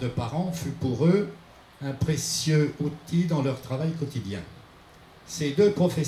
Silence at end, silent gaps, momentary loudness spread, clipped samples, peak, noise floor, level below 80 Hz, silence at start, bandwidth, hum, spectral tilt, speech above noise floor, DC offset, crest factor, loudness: 0 s; none; 13 LU; under 0.1%; -10 dBFS; -51 dBFS; -56 dBFS; 0 s; 15 kHz; none; -6 dB/octave; 26 dB; under 0.1%; 18 dB; -26 LUFS